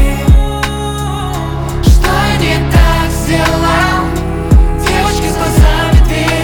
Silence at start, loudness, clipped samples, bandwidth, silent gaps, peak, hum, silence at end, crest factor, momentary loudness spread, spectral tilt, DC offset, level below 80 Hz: 0 s; -12 LUFS; under 0.1%; 19.5 kHz; none; 0 dBFS; none; 0 s; 10 dB; 7 LU; -5.5 dB/octave; under 0.1%; -12 dBFS